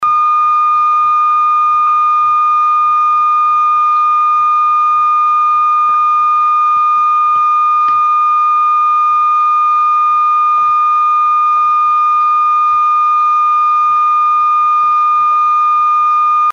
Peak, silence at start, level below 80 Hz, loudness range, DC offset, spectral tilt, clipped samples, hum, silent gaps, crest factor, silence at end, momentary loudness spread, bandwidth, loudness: -6 dBFS; 0 s; -60 dBFS; 0 LU; under 0.1%; -1.5 dB/octave; under 0.1%; none; none; 4 dB; 0 s; 0 LU; 6.8 kHz; -10 LUFS